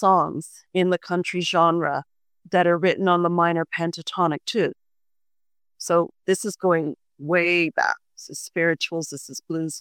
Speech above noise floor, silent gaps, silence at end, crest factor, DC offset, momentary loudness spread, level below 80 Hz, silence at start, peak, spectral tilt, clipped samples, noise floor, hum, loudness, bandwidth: over 68 dB; none; 0 s; 18 dB; under 0.1%; 12 LU; -72 dBFS; 0 s; -4 dBFS; -5 dB/octave; under 0.1%; under -90 dBFS; none; -23 LUFS; 17 kHz